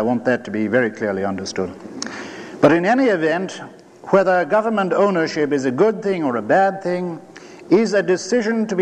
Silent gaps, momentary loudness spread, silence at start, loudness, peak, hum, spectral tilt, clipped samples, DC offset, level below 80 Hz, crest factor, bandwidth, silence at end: none; 13 LU; 0 s; -18 LUFS; -2 dBFS; none; -5.5 dB/octave; under 0.1%; under 0.1%; -66 dBFS; 18 dB; 9.8 kHz; 0 s